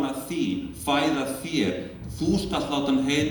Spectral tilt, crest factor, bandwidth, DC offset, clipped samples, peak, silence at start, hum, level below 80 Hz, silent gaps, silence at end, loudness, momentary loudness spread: -5 dB/octave; 14 dB; 19 kHz; under 0.1%; under 0.1%; -10 dBFS; 0 s; none; -46 dBFS; none; 0 s; -26 LUFS; 6 LU